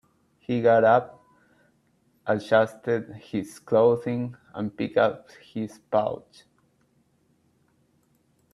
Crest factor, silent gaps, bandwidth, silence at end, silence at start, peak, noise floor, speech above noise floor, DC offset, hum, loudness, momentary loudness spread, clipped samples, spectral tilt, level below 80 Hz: 20 dB; none; 12.5 kHz; 2.35 s; 0.5 s; -6 dBFS; -66 dBFS; 42 dB; under 0.1%; none; -25 LUFS; 16 LU; under 0.1%; -7 dB/octave; -68 dBFS